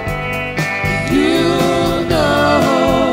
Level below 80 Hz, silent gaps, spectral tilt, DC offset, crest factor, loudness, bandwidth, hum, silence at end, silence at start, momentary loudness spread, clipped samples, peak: -32 dBFS; none; -5.5 dB/octave; under 0.1%; 14 dB; -14 LUFS; 16 kHz; none; 0 s; 0 s; 6 LU; under 0.1%; 0 dBFS